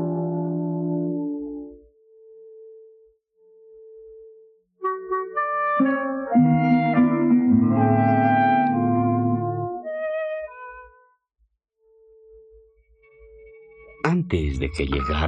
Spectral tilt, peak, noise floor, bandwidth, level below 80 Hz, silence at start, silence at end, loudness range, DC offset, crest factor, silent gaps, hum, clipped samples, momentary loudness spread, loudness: -8.5 dB/octave; -6 dBFS; -69 dBFS; 8.8 kHz; -42 dBFS; 0 s; 0 s; 16 LU; under 0.1%; 18 dB; none; none; under 0.1%; 12 LU; -22 LUFS